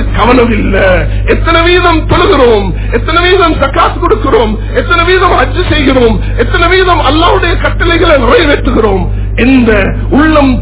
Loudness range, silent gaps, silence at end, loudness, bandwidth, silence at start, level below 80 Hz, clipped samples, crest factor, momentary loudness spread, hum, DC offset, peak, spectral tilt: 1 LU; none; 0 s; -7 LUFS; 4 kHz; 0 s; -14 dBFS; 5%; 6 dB; 5 LU; 50 Hz at -15 dBFS; under 0.1%; 0 dBFS; -10 dB/octave